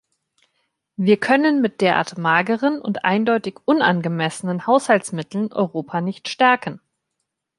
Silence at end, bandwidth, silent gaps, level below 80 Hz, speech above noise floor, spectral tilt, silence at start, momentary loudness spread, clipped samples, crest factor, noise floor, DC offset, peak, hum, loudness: 0.8 s; 11.5 kHz; none; -68 dBFS; 59 dB; -5.5 dB/octave; 1 s; 9 LU; under 0.1%; 18 dB; -78 dBFS; under 0.1%; -2 dBFS; none; -19 LUFS